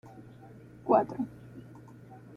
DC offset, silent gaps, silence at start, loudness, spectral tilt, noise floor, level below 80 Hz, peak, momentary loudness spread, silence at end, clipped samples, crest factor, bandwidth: under 0.1%; none; 0.05 s; -30 LUFS; -9 dB/octave; -51 dBFS; -66 dBFS; -12 dBFS; 25 LU; 0 s; under 0.1%; 22 dB; 10.5 kHz